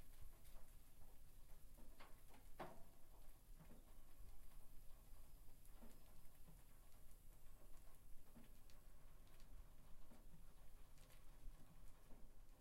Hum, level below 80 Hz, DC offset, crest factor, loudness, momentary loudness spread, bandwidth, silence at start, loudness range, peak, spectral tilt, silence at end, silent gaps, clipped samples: none; -62 dBFS; under 0.1%; 14 dB; -68 LUFS; 3 LU; 16 kHz; 0 s; 4 LU; -42 dBFS; -4.5 dB/octave; 0 s; none; under 0.1%